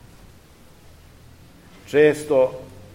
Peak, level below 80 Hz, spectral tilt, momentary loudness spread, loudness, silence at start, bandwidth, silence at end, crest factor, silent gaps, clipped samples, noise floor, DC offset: -4 dBFS; -54 dBFS; -5.5 dB/octave; 8 LU; -19 LUFS; 1.9 s; 16 kHz; 0.3 s; 20 dB; none; under 0.1%; -49 dBFS; 0.2%